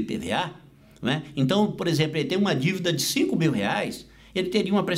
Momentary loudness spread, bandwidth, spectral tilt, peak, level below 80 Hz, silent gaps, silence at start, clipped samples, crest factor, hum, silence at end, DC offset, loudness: 9 LU; 16 kHz; -5 dB/octave; -10 dBFS; -58 dBFS; none; 0 s; under 0.1%; 14 dB; none; 0 s; under 0.1%; -25 LUFS